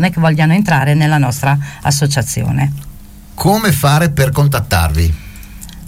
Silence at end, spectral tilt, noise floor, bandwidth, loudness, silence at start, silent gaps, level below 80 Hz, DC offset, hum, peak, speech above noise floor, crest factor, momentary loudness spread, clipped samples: 0 s; -5.5 dB/octave; -33 dBFS; 16.5 kHz; -13 LUFS; 0 s; none; -28 dBFS; under 0.1%; none; -2 dBFS; 21 dB; 12 dB; 8 LU; under 0.1%